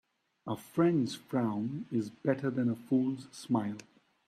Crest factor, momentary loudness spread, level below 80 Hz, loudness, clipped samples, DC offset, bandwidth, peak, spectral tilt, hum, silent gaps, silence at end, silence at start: 18 dB; 12 LU; -76 dBFS; -33 LUFS; under 0.1%; under 0.1%; 14 kHz; -16 dBFS; -7 dB/octave; none; none; 0.45 s; 0.45 s